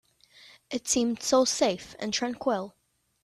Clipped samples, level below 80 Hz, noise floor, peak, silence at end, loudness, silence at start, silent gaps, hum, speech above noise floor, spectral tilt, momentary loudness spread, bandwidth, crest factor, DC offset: under 0.1%; -64 dBFS; -56 dBFS; -12 dBFS; 0.55 s; -27 LUFS; 0.7 s; none; none; 29 dB; -2.5 dB/octave; 11 LU; 14 kHz; 18 dB; under 0.1%